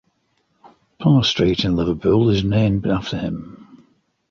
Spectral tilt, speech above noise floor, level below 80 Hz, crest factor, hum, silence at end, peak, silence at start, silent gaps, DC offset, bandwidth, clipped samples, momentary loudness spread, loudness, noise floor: -7 dB/octave; 49 dB; -40 dBFS; 16 dB; none; 0.7 s; -4 dBFS; 1 s; none; under 0.1%; 7.4 kHz; under 0.1%; 11 LU; -18 LUFS; -66 dBFS